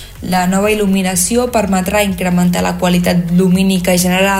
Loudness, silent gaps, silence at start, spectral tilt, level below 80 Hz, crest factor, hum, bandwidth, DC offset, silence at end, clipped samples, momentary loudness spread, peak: -13 LUFS; none; 0 s; -5 dB/octave; -34 dBFS; 12 dB; none; 16.5 kHz; under 0.1%; 0 s; under 0.1%; 3 LU; -2 dBFS